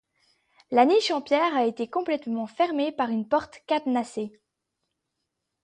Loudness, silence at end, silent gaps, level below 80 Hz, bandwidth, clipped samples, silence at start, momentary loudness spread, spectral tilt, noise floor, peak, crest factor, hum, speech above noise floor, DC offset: -25 LUFS; 1.35 s; none; -70 dBFS; 10 kHz; under 0.1%; 0.7 s; 10 LU; -4.5 dB/octave; -81 dBFS; -6 dBFS; 20 dB; none; 57 dB; under 0.1%